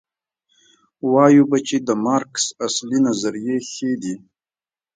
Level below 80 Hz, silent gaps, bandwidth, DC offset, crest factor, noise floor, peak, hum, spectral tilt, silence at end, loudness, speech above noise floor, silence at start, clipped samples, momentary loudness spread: -66 dBFS; none; 9.4 kHz; under 0.1%; 20 dB; under -90 dBFS; 0 dBFS; none; -4.5 dB/octave; 0.8 s; -19 LUFS; over 72 dB; 1.05 s; under 0.1%; 13 LU